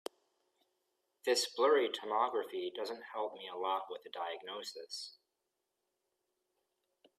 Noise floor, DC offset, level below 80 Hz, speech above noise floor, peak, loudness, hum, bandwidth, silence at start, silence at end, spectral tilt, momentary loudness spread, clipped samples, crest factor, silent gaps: -87 dBFS; under 0.1%; under -90 dBFS; 50 dB; -18 dBFS; -37 LUFS; none; 15.5 kHz; 1.25 s; 2.1 s; -1 dB/octave; 15 LU; under 0.1%; 20 dB; none